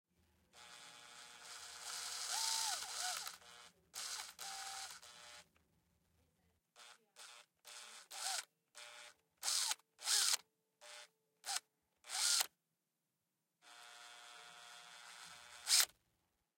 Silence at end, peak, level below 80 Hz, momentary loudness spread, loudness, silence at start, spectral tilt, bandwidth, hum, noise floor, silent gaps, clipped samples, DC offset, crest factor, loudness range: 0.7 s; -16 dBFS; under -90 dBFS; 24 LU; -39 LUFS; 0.55 s; 3.5 dB/octave; 16.5 kHz; none; -89 dBFS; none; under 0.1%; under 0.1%; 30 dB; 14 LU